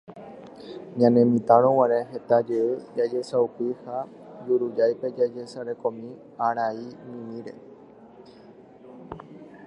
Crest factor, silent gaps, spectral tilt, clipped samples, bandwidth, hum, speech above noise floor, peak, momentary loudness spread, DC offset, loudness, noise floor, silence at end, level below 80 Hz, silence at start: 22 dB; none; -8 dB/octave; under 0.1%; 10 kHz; none; 25 dB; -4 dBFS; 23 LU; under 0.1%; -24 LUFS; -49 dBFS; 0 s; -68 dBFS; 0.1 s